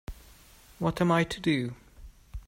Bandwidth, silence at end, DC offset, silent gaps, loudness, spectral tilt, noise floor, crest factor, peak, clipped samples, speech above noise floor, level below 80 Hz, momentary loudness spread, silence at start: 16 kHz; 0.1 s; under 0.1%; none; -28 LUFS; -6 dB/octave; -55 dBFS; 18 dB; -14 dBFS; under 0.1%; 28 dB; -48 dBFS; 22 LU; 0.1 s